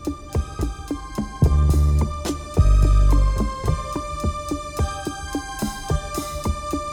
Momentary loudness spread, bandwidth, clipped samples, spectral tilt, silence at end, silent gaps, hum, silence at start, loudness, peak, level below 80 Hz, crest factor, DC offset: 11 LU; 15.5 kHz; under 0.1%; -6 dB/octave; 0 s; none; none; 0 s; -23 LUFS; -4 dBFS; -22 dBFS; 16 dB; under 0.1%